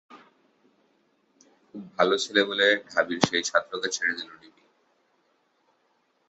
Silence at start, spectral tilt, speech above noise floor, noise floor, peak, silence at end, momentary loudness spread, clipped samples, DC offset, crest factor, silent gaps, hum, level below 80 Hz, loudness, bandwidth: 0.1 s; -2.5 dB/octave; 44 dB; -70 dBFS; -2 dBFS; 1.95 s; 19 LU; under 0.1%; under 0.1%; 28 dB; none; none; -68 dBFS; -24 LUFS; 8.4 kHz